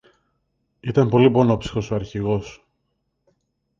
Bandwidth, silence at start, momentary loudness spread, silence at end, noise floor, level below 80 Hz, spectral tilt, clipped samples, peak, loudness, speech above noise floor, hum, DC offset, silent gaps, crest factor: 7.6 kHz; 0.85 s; 12 LU; 1.25 s; -73 dBFS; -46 dBFS; -8 dB/octave; under 0.1%; -2 dBFS; -20 LUFS; 54 dB; none; under 0.1%; none; 20 dB